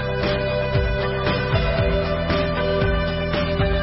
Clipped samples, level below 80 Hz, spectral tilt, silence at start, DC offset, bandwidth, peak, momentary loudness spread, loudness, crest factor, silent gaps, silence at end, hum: under 0.1%; -28 dBFS; -10.5 dB/octave; 0 s; under 0.1%; 5.8 kHz; -8 dBFS; 2 LU; -21 LUFS; 14 dB; none; 0 s; none